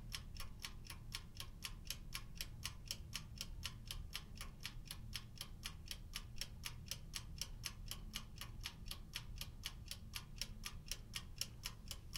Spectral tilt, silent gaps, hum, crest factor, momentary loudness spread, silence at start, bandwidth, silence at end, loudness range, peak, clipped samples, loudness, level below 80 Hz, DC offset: -2 dB/octave; none; none; 26 dB; 5 LU; 0 s; 18 kHz; 0 s; 1 LU; -24 dBFS; under 0.1%; -50 LUFS; -54 dBFS; under 0.1%